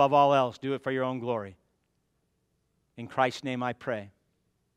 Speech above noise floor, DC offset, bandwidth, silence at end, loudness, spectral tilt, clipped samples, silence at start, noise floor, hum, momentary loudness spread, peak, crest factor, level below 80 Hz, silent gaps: 48 dB; under 0.1%; 12 kHz; 0.65 s; -29 LUFS; -6 dB/octave; under 0.1%; 0 s; -75 dBFS; none; 14 LU; -10 dBFS; 20 dB; -76 dBFS; none